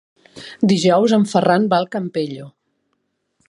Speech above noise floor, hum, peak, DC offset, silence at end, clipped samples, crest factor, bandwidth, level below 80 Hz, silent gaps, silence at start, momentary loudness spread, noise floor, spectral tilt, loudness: 54 dB; none; -2 dBFS; under 0.1%; 1 s; under 0.1%; 18 dB; 11 kHz; -64 dBFS; none; 0.35 s; 19 LU; -71 dBFS; -6 dB/octave; -17 LUFS